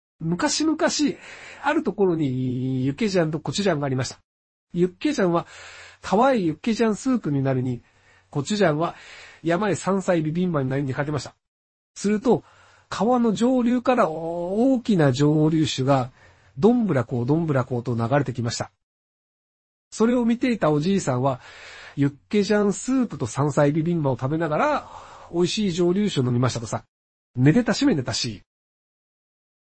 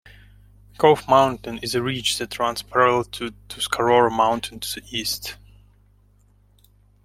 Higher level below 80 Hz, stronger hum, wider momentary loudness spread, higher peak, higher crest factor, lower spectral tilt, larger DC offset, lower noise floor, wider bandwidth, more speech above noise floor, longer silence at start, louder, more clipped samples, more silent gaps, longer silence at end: about the same, -54 dBFS vs -50 dBFS; second, none vs 50 Hz at -45 dBFS; about the same, 12 LU vs 13 LU; about the same, -4 dBFS vs -2 dBFS; about the same, 18 dB vs 20 dB; first, -6 dB/octave vs -3.5 dB/octave; neither; first, under -90 dBFS vs -57 dBFS; second, 8.8 kHz vs 16.5 kHz; first, over 68 dB vs 36 dB; second, 0.2 s vs 0.8 s; about the same, -23 LUFS vs -21 LUFS; neither; first, 4.24-4.67 s, 11.48-11.94 s, 18.83-19.91 s, 26.88-27.34 s vs none; second, 1.3 s vs 1.7 s